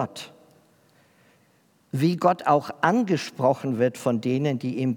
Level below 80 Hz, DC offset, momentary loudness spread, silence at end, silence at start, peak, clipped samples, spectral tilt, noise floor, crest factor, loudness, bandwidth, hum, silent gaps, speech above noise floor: -80 dBFS; under 0.1%; 10 LU; 0 s; 0 s; -4 dBFS; under 0.1%; -6.5 dB/octave; -62 dBFS; 20 dB; -24 LUFS; 18.5 kHz; none; none; 39 dB